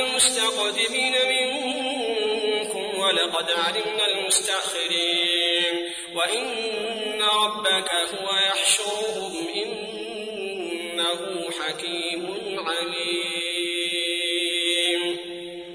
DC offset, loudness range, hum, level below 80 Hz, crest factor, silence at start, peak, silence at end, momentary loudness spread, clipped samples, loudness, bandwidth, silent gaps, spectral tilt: under 0.1%; 6 LU; none; -66 dBFS; 18 dB; 0 s; -6 dBFS; 0 s; 10 LU; under 0.1%; -23 LUFS; 11 kHz; none; -0.5 dB/octave